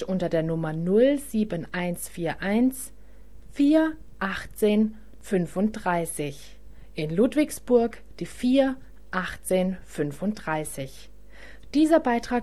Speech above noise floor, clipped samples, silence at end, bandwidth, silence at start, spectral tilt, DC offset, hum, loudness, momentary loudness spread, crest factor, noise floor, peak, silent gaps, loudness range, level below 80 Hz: 24 dB; under 0.1%; 0 s; 13.5 kHz; 0 s; -6 dB/octave; 0.8%; none; -25 LUFS; 14 LU; 18 dB; -49 dBFS; -8 dBFS; none; 2 LU; -50 dBFS